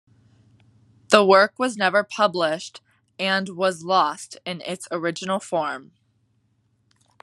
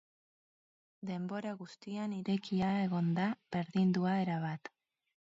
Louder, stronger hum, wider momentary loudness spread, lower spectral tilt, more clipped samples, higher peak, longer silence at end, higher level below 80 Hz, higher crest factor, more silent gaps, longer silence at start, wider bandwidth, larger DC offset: first, -21 LUFS vs -35 LUFS; neither; first, 15 LU vs 12 LU; second, -4 dB/octave vs -6.5 dB/octave; neither; first, 0 dBFS vs -22 dBFS; first, 1.4 s vs 0.55 s; about the same, -76 dBFS vs -72 dBFS; first, 24 dB vs 14 dB; neither; about the same, 1.1 s vs 1 s; first, 12.5 kHz vs 7.6 kHz; neither